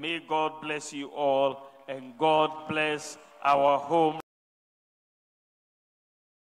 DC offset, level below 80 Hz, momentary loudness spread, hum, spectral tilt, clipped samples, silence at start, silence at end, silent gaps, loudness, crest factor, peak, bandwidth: under 0.1%; -76 dBFS; 17 LU; none; -4 dB/octave; under 0.1%; 0 s; 2.25 s; none; -27 LUFS; 20 dB; -10 dBFS; 12.5 kHz